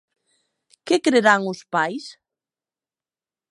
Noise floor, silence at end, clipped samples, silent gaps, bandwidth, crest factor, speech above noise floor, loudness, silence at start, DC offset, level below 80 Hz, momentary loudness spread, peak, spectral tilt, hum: under -90 dBFS; 1.4 s; under 0.1%; none; 11.5 kHz; 22 dB; over 70 dB; -20 LUFS; 0.85 s; under 0.1%; -78 dBFS; 21 LU; -2 dBFS; -4 dB/octave; none